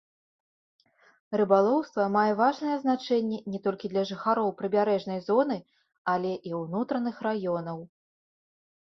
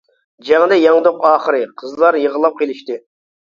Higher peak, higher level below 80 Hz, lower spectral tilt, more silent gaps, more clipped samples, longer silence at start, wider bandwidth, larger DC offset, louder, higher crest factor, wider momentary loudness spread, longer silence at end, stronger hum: second, -8 dBFS vs 0 dBFS; second, -74 dBFS vs -64 dBFS; first, -7 dB/octave vs -5 dB/octave; first, 5.98-6.05 s vs none; neither; first, 1.3 s vs 0.45 s; second, 6.4 kHz vs 7.2 kHz; neither; second, -28 LUFS vs -14 LUFS; first, 20 dB vs 14 dB; second, 9 LU vs 16 LU; first, 1.15 s vs 0.55 s; neither